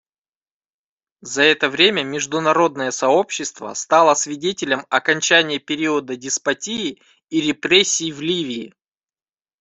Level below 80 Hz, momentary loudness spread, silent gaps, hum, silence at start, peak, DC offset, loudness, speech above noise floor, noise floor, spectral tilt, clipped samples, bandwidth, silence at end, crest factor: -64 dBFS; 11 LU; none; none; 1.25 s; 0 dBFS; under 0.1%; -18 LUFS; over 71 dB; under -90 dBFS; -2 dB/octave; under 0.1%; 8.4 kHz; 0.9 s; 20 dB